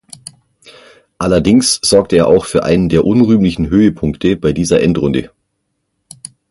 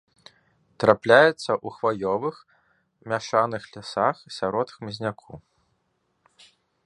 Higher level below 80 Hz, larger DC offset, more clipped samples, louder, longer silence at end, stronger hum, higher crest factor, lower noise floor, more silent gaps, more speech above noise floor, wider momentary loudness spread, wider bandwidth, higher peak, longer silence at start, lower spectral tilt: first, -34 dBFS vs -64 dBFS; neither; neither; first, -12 LUFS vs -24 LUFS; second, 1.25 s vs 1.5 s; neither; second, 14 dB vs 24 dB; about the same, -69 dBFS vs -72 dBFS; neither; first, 57 dB vs 49 dB; about the same, 14 LU vs 15 LU; about the same, 11.5 kHz vs 11 kHz; about the same, 0 dBFS vs 0 dBFS; first, 1.2 s vs 0.8 s; about the same, -5.5 dB/octave vs -5 dB/octave